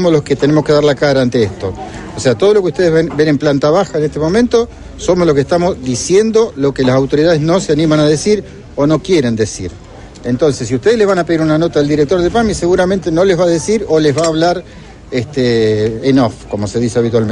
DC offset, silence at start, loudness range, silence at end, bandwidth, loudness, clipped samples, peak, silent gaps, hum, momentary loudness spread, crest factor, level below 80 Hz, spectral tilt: under 0.1%; 0 s; 2 LU; 0 s; 10.5 kHz; -13 LUFS; under 0.1%; 0 dBFS; none; none; 8 LU; 12 dB; -36 dBFS; -6 dB/octave